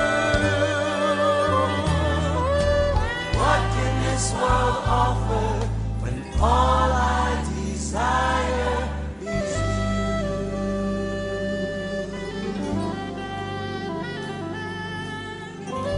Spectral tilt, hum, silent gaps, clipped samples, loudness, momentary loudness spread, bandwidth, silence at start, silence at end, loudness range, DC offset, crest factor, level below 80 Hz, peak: -5.5 dB/octave; none; none; under 0.1%; -24 LUFS; 10 LU; 10.5 kHz; 0 s; 0 s; 7 LU; under 0.1%; 16 dB; -30 dBFS; -6 dBFS